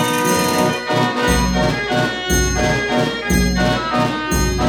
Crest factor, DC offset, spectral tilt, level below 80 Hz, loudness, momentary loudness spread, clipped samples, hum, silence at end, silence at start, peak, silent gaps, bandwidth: 14 dB; under 0.1%; -4 dB/octave; -26 dBFS; -17 LUFS; 3 LU; under 0.1%; none; 0 s; 0 s; -2 dBFS; none; 19 kHz